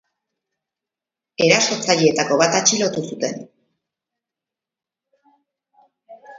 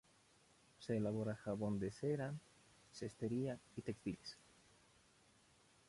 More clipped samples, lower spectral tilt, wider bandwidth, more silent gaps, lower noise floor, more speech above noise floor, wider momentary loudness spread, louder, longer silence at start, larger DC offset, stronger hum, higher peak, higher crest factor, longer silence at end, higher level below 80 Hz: neither; second, -2.5 dB/octave vs -7 dB/octave; second, 7.8 kHz vs 11.5 kHz; neither; first, -88 dBFS vs -72 dBFS; first, 70 dB vs 29 dB; about the same, 12 LU vs 13 LU; first, -17 LUFS vs -45 LUFS; first, 1.4 s vs 0.8 s; neither; neither; first, 0 dBFS vs -28 dBFS; about the same, 22 dB vs 18 dB; second, 0 s vs 1.55 s; about the same, -68 dBFS vs -72 dBFS